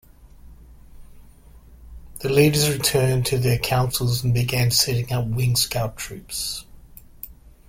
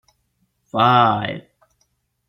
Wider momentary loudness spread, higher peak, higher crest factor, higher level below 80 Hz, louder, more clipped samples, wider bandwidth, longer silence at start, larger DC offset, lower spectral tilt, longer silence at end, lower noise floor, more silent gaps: about the same, 16 LU vs 15 LU; about the same, -2 dBFS vs -2 dBFS; about the same, 20 dB vs 20 dB; first, -42 dBFS vs -60 dBFS; second, -21 LUFS vs -17 LUFS; neither; about the same, 16.5 kHz vs 15 kHz; second, 0.25 s vs 0.75 s; neither; second, -4.5 dB/octave vs -7.5 dB/octave; second, 0.2 s vs 0.9 s; second, -47 dBFS vs -68 dBFS; neither